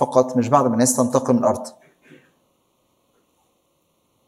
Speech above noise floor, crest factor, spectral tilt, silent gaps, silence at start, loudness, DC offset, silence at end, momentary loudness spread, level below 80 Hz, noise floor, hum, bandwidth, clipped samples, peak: 48 dB; 20 dB; -5.5 dB/octave; none; 0 s; -18 LUFS; under 0.1%; 2.6 s; 8 LU; -70 dBFS; -66 dBFS; none; 15 kHz; under 0.1%; -2 dBFS